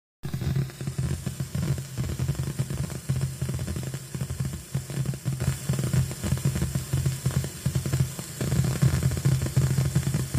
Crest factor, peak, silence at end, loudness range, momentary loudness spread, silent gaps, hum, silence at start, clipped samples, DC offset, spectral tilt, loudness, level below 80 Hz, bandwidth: 18 dB; -8 dBFS; 0 s; 5 LU; 8 LU; none; none; 0.25 s; under 0.1%; under 0.1%; -5.5 dB/octave; -28 LUFS; -40 dBFS; 16 kHz